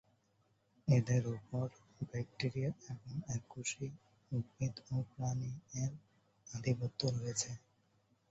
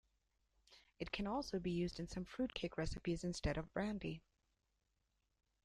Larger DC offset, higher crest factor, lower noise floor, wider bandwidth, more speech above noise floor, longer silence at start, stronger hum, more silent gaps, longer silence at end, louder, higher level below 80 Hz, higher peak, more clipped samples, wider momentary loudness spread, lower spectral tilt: neither; about the same, 20 dB vs 18 dB; second, -76 dBFS vs -85 dBFS; second, 8 kHz vs 11.5 kHz; second, 37 dB vs 42 dB; first, 0.85 s vs 0.7 s; neither; neither; second, 0.75 s vs 1.45 s; first, -40 LUFS vs -44 LUFS; second, -68 dBFS vs -56 dBFS; first, -20 dBFS vs -26 dBFS; neither; first, 11 LU vs 6 LU; about the same, -7 dB/octave vs -6 dB/octave